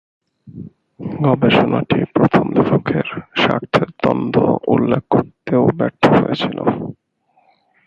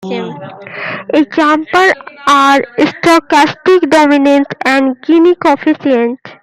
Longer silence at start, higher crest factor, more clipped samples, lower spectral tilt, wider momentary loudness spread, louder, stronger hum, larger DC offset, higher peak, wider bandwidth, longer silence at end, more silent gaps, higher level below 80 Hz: first, 0.45 s vs 0 s; first, 16 dB vs 10 dB; neither; first, -8 dB/octave vs -4.5 dB/octave; about the same, 11 LU vs 13 LU; second, -16 LUFS vs -10 LUFS; neither; neither; about the same, 0 dBFS vs 0 dBFS; second, 7.6 kHz vs 15 kHz; first, 0.95 s vs 0.1 s; neither; first, -48 dBFS vs -54 dBFS